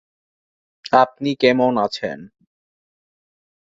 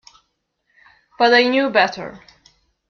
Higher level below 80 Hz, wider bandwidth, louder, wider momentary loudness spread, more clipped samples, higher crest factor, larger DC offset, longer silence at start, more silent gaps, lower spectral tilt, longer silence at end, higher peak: about the same, -64 dBFS vs -62 dBFS; first, 7.8 kHz vs 7 kHz; about the same, -18 LUFS vs -16 LUFS; about the same, 16 LU vs 18 LU; neither; about the same, 20 dB vs 18 dB; neither; second, 0.9 s vs 1.2 s; neither; first, -5.5 dB/octave vs -4 dB/octave; first, 1.35 s vs 0.7 s; about the same, -2 dBFS vs -2 dBFS